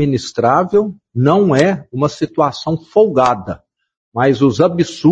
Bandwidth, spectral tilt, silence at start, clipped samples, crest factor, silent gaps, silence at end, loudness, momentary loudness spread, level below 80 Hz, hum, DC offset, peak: 8.6 kHz; -7 dB/octave; 0 s; under 0.1%; 14 dB; 3.97-4.12 s; 0 s; -15 LUFS; 10 LU; -50 dBFS; none; under 0.1%; 0 dBFS